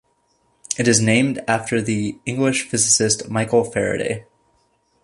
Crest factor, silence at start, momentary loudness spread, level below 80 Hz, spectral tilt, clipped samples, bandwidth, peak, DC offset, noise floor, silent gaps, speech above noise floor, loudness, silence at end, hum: 18 dB; 0.7 s; 10 LU; -54 dBFS; -3.5 dB/octave; under 0.1%; 11.5 kHz; -2 dBFS; under 0.1%; -64 dBFS; none; 45 dB; -19 LUFS; 0.8 s; none